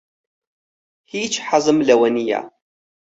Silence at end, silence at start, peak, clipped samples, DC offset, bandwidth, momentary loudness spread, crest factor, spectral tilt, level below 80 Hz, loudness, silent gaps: 0.55 s; 1.15 s; -2 dBFS; under 0.1%; under 0.1%; 8.2 kHz; 11 LU; 18 dB; -3.5 dB/octave; -64 dBFS; -18 LUFS; none